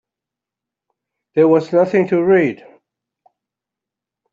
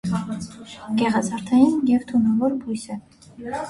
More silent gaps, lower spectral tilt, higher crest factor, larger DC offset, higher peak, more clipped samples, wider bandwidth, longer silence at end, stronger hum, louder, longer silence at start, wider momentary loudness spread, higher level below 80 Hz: neither; first, -8.5 dB/octave vs -6 dB/octave; about the same, 16 dB vs 18 dB; neither; about the same, -2 dBFS vs -4 dBFS; neither; second, 7.4 kHz vs 11.5 kHz; first, 1.8 s vs 0 s; neither; first, -15 LUFS vs -21 LUFS; first, 1.35 s vs 0.05 s; second, 9 LU vs 18 LU; second, -64 dBFS vs -54 dBFS